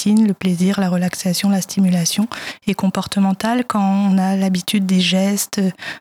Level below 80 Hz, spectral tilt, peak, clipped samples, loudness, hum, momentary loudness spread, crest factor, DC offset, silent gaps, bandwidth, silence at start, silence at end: -58 dBFS; -5 dB/octave; -2 dBFS; under 0.1%; -17 LUFS; none; 5 LU; 16 dB; under 0.1%; none; 16 kHz; 0 s; 0 s